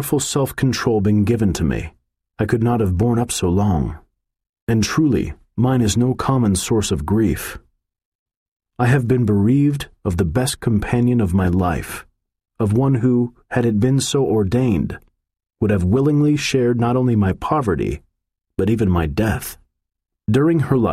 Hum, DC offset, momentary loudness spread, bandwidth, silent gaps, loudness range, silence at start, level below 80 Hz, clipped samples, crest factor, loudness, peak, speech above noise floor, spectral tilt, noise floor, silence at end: none; under 0.1%; 9 LU; 15.5 kHz; 4.49-4.53 s, 4.62-4.67 s, 8.05-8.26 s, 8.36-8.56 s; 2 LU; 0 s; -36 dBFS; under 0.1%; 14 dB; -18 LUFS; -4 dBFS; 59 dB; -6.5 dB/octave; -76 dBFS; 0 s